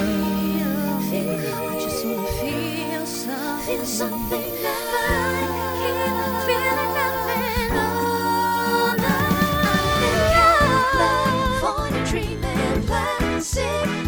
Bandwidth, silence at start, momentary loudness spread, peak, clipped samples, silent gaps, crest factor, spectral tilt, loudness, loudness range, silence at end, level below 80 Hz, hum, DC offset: over 20 kHz; 0 s; 7 LU; -4 dBFS; under 0.1%; none; 16 dB; -4.5 dB/octave; -21 LUFS; 7 LU; 0 s; -34 dBFS; none; under 0.1%